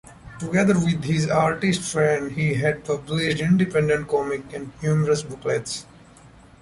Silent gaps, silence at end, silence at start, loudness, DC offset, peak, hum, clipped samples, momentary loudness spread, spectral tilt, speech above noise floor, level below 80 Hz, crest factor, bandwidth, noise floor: none; 0.35 s; 0.05 s; -22 LUFS; under 0.1%; -6 dBFS; none; under 0.1%; 9 LU; -6 dB/octave; 27 dB; -50 dBFS; 16 dB; 11.5 kHz; -48 dBFS